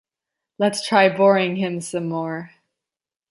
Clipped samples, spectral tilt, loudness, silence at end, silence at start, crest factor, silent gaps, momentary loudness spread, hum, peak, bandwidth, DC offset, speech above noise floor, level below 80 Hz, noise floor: under 0.1%; -5 dB/octave; -20 LUFS; 0.85 s; 0.6 s; 20 dB; none; 12 LU; none; -2 dBFS; 11.5 kHz; under 0.1%; 70 dB; -72 dBFS; -89 dBFS